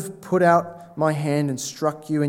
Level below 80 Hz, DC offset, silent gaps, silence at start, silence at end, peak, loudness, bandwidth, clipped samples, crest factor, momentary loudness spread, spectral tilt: -70 dBFS; under 0.1%; none; 0 s; 0 s; -4 dBFS; -22 LUFS; 16.5 kHz; under 0.1%; 18 dB; 9 LU; -6 dB/octave